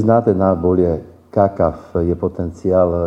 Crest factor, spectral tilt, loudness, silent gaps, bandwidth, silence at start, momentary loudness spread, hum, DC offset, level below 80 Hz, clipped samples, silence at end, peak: 16 dB; -10.5 dB/octave; -17 LUFS; none; 8 kHz; 0 s; 8 LU; none; under 0.1%; -38 dBFS; under 0.1%; 0 s; 0 dBFS